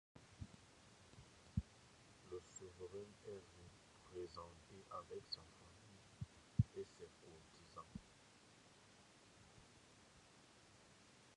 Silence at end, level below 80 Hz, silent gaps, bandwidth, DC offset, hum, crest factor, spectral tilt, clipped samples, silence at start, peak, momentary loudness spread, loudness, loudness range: 0 s; -64 dBFS; none; 11 kHz; under 0.1%; none; 32 dB; -6 dB/octave; under 0.1%; 0.15 s; -22 dBFS; 17 LU; -53 LUFS; 13 LU